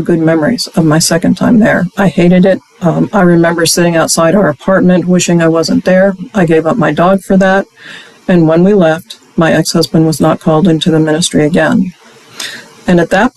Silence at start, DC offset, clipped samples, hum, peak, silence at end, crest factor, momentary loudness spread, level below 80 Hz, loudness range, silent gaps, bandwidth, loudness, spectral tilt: 0 s; under 0.1%; under 0.1%; none; 0 dBFS; 0.05 s; 8 dB; 6 LU; -40 dBFS; 2 LU; none; 13.5 kHz; -9 LUFS; -5.5 dB/octave